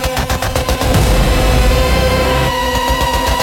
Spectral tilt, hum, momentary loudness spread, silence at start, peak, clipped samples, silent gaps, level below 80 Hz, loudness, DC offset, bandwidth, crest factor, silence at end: -4.5 dB/octave; none; 4 LU; 0 s; 0 dBFS; under 0.1%; none; -16 dBFS; -14 LUFS; under 0.1%; 17 kHz; 12 dB; 0 s